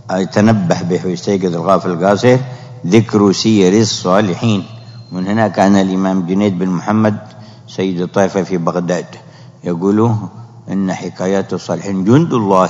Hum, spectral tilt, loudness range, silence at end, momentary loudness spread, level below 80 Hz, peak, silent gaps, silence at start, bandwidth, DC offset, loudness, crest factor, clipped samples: none; -6.5 dB/octave; 5 LU; 0 s; 12 LU; -56 dBFS; 0 dBFS; none; 0.05 s; 7.8 kHz; under 0.1%; -14 LUFS; 14 dB; 0.2%